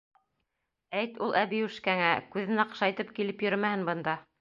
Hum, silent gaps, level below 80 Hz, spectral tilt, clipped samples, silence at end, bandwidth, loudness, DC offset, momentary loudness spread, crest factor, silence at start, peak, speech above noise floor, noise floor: none; none; -76 dBFS; -6.5 dB/octave; under 0.1%; 0.2 s; 7.2 kHz; -30 LUFS; under 0.1%; 7 LU; 22 dB; 0.9 s; -10 dBFS; 53 dB; -83 dBFS